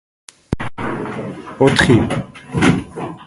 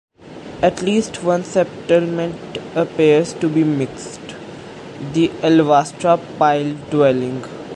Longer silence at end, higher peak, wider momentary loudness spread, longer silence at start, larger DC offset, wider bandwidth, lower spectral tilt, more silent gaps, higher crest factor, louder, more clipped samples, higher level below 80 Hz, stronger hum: about the same, 0 s vs 0 s; about the same, 0 dBFS vs -2 dBFS; second, 15 LU vs 18 LU; first, 0.5 s vs 0.25 s; neither; about the same, 11.5 kHz vs 11.5 kHz; about the same, -6 dB/octave vs -6 dB/octave; neither; about the same, 18 dB vs 16 dB; about the same, -17 LUFS vs -17 LUFS; neither; first, -38 dBFS vs -52 dBFS; neither